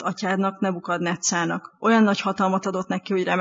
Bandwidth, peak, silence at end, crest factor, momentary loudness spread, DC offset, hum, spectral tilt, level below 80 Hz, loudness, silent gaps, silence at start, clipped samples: 7.8 kHz; -6 dBFS; 0 s; 16 dB; 8 LU; under 0.1%; none; -4.5 dB/octave; -72 dBFS; -23 LUFS; none; 0 s; under 0.1%